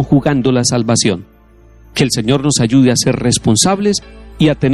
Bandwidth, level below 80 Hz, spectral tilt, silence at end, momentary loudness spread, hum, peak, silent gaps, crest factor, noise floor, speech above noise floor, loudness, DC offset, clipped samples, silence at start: 12.5 kHz; -38 dBFS; -4.5 dB/octave; 0 s; 6 LU; none; 0 dBFS; none; 12 dB; -43 dBFS; 31 dB; -13 LUFS; under 0.1%; under 0.1%; 0 s